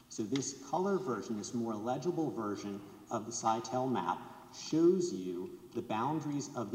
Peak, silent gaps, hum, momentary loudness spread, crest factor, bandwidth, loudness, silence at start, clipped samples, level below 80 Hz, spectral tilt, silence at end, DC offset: -18 dBFS; none; none; 12 LU; 18 dB; 16 kHz; -36 LUFS; 0.1 s; under 0.1%; -76 dBFS; -5.5 dB/octave; 0 s; under 0.1%